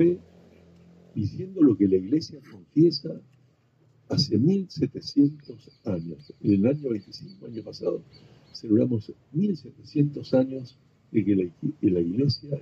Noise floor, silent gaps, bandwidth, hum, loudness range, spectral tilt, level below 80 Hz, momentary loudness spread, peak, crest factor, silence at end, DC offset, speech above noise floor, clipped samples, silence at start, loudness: -62 dBFS; none; 7.2 kHz; none; 3 LU; -8 dB/octave; -62 dBFS; 17 LU; -10 dBFS; 16 dB; 0 s; under 0.1%; 37 dB; under 0.1%; 0 s; -26 LUFS